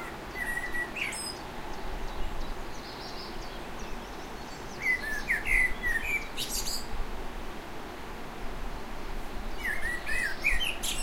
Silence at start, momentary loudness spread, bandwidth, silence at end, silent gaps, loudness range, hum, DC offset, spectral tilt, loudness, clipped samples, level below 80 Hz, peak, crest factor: 0 s; 14 LU; 16 kHz; 0 s; none; 9 LU; none; under 0.1%; -2 dB/octave; -33 LUFS; under 0.1%; -38 dBFS; -12 dBFS; 20 dB